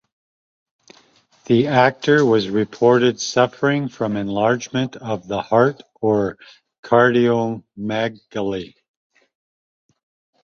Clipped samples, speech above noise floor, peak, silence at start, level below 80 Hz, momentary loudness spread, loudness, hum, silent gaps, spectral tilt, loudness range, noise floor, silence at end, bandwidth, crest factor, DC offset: under 0.1%; 37 dB; -2 dBFS; 1.5 s; -58 dBFS; 11 LU; -19 LUFS; none; 6.79-6.83 s; -5.5 dB/octave; 4 LU; -55 dBFS; 1.8 s; 7.4 kHz; 18 dB; under 0.1%